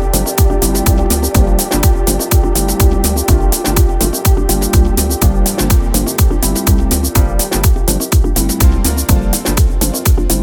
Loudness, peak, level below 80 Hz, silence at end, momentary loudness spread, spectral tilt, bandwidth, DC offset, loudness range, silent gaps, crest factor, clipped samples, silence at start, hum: -13 LUFS; 0 dBFS; -14 dBFS; 0 s; 2 LU; -5 dB/octave; over 20 kHz; under 0.1%; 1 LU; none; 10 dB; under 0.1%; 0 s; none